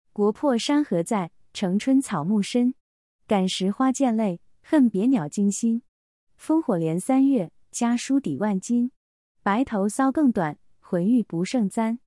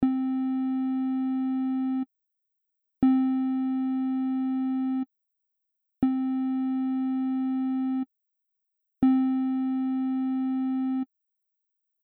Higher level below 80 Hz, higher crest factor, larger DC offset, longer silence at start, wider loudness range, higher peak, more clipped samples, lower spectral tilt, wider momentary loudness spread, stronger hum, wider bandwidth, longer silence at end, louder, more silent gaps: about the same, -64 dBFS vs -62 dBFS; about the same, 14 dB vs 16 dB; neither; first, 0.15 s vs 0 s; about the same, 1 LU vs 1 LU; about the same, -10 dBFS vs -12 dBFS; neither; second, -5.5 dB/octave vs -10 dB/octave; about the same, 8 LU vs 6 LU; neither; first, 12 kHz vs 4.1 kHz; second, 0.1 s vs 1 s; first, -24 LUFS vs -27 LUFS; first, 2.80-3.19 s, 5.88-6.27 s, 8.96-9.35 s vs none